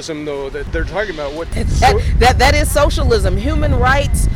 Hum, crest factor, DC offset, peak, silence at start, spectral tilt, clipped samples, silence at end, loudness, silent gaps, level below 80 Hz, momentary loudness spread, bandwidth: none; 10 dB; under 0.1%; -4 dBFS; 0 s; -5 dB/octave; under 0.1%; 0 s; -15 LUFS; none; -18 dBFS; 11 LU; 16 kHz